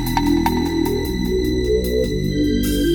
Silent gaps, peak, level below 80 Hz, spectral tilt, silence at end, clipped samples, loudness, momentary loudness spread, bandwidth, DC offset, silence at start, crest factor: none; -4 dBFS; -28 dBFS; -6 dB/octave; 0 s; under 0.1%; -19 LUFS; 3 LU; over 20 kHz; under 0.1%; 0 s; 14 dB